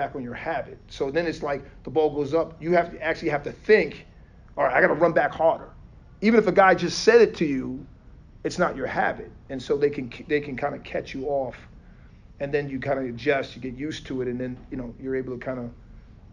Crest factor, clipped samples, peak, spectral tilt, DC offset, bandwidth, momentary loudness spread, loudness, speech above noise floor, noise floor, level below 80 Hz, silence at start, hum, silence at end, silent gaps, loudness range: 20 dB; under 0.1%; -4 dBFS; -5.5 dB/octave; under 0.1%; 10 kHz; 16 LU; -24 LUFS; 24 dB; -48 dBFS; -50 dBFS; 0 s; none; 0.05 s; none; 9 LU